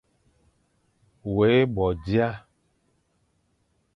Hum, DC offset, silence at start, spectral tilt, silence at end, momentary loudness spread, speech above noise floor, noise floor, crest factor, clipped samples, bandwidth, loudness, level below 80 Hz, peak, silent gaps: none; under 0.1%; 1.25 s; -9 dB/octave; 1.55 s; 15 LU; 47 dB; -70 dBFS; 18 dB; under 0.1%; 6 kHz; -23 LUFS; -48 dBFS; -8 dBFS; none